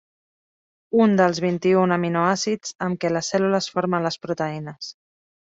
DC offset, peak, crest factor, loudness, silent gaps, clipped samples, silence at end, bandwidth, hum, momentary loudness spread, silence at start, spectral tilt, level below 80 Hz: under 0.1%; -6 dBFS; 18 dB; -21 LUFS; 2.75-2.79 s; under 0.1%; 0.6 s; 8 kHz; none; 10 LU; 0.95 s; -5.5 dB/octave; -64 dBFS